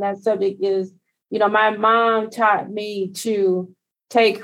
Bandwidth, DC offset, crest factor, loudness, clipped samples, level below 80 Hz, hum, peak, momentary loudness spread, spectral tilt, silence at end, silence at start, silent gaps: 16 kHz; under 0.1%; 16 dB; -20 LUFS; under 0.1%; -78 dBFS; none; -4 dBFS; 10 LU; -4.5 dB/octave; 0 s; 0 s; none